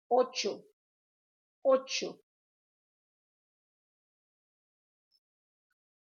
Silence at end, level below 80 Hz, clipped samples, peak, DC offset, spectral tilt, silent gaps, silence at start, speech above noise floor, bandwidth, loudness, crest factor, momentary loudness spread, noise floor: 4 s; under -90 dBFS; under 0.1%; -14 dBFS; under 0.1%; -2 dB/octave; 0.73-1.62 s; 0.1 s; over 60 dB; 7.2 kHz; -31 LUFS; 22 dB; 12 LU; under -90 dBFS